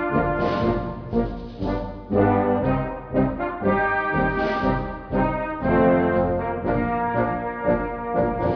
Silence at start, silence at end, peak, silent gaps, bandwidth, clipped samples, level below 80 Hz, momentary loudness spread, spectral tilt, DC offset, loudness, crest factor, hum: 0 s; 0 s; -6 dBFS; none; 5.4 kHz; under 0.1%; -36 dBFS; 8 LU; -9.5 dB/octave; under 0.1%; -23 LUFS; 16 dB; none